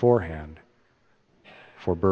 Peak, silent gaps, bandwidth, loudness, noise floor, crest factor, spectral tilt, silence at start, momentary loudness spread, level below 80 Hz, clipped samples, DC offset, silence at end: -6 dBFS; none; 5.8 kHz; -27 LUFS; -64 dBFS; 20 dB; -10 dB/octave; 0 s; 26 LU; -48 dBFS; under 0.1%; under 0.1%; 0 s